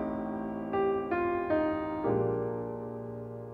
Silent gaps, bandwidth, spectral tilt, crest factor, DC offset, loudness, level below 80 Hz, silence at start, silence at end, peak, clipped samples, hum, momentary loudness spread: none; 4.8 kHz; -10 dB/octave; 14 dB; under 0.1%; -32 LUFS; -58 dBFS; 0 s; 0 s; -18 dBFS; under 0.1%; none; 10 LU